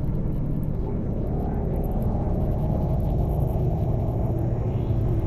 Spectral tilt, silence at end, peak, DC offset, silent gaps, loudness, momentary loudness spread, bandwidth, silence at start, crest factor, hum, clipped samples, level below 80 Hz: -11 dB/octave; 0 s; -12 dBFS; under 0.1%; none; -26 LUFS; 3 LU; 13.5 kHz; 0 s; 12 dB; none; under 0.1%; -28 dBFS